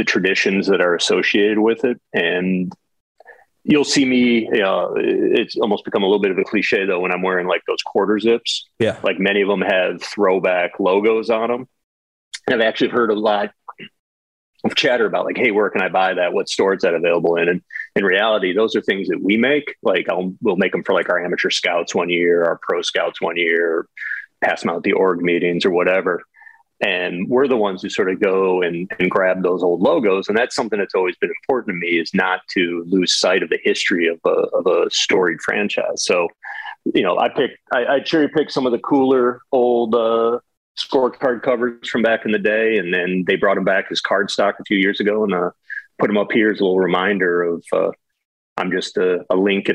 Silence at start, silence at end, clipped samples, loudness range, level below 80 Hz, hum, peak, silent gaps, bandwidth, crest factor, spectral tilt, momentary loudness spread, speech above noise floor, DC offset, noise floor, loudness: 0 s; 0 s; under 0.1%; 2 LU; -64 dBFS; none; -4 dBFS; 3.00-3.15 s, 11.84-12.31 s, 13.99-14.53 s, 40.57-40.75 s, 48.25-48.56 s; 11 kHz; 14 dB; -4.5 dB/octave; 6 LU; 29 dB; under 0.1%; -47 dBFS; -18 LUFS